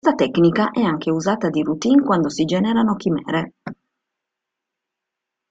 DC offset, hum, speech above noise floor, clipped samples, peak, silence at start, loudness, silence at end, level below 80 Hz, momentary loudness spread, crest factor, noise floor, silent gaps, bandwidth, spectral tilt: under 0.1%; none; 65 dB; under 0.1%; -4 dBFS; 0.05 s; -19 LUFS; 1.75 s; -58 dBFS; 8 LU; 16 dB; -83 dBFS; none; 8 kHz; -6.5 dB/octave